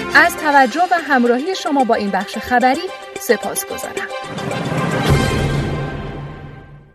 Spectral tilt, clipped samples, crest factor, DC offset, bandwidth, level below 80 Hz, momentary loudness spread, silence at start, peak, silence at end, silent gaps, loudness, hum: -5 dB/octave; under 0.1%; 18 dB; under 0.1%; 14 kHz; -36 dBFS; 14 LU; 0 s; 0 dBFS; 0.15 s; none; -17 LUFS; none